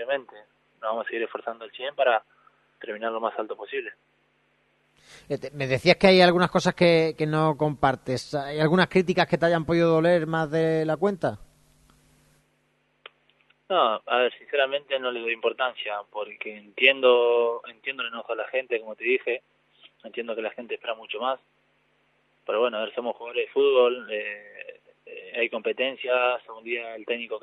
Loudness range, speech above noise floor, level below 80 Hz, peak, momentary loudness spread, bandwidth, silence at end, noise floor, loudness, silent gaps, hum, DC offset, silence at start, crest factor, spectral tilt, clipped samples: 9 LU; 44 dB; -60 dBFS; -2 dBFS; 15 LU; 11.5 kHz; 0.05 s; -69 dBFS; -25 LUFS; none; none; under 0.1%; 0 s; 24 dB; -6 dB/octave; under 0.1%